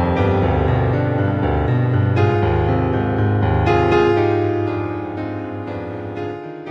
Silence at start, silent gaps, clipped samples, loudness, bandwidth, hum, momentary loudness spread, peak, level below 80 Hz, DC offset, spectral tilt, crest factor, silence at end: 0 s; none; under 0.1%; -18 LUFS; 6.4 kHz; none; 12 LU; -4 dBFS; -32 dBFS; under 0.1%; -9 dB/octave; 14 dB; 0 s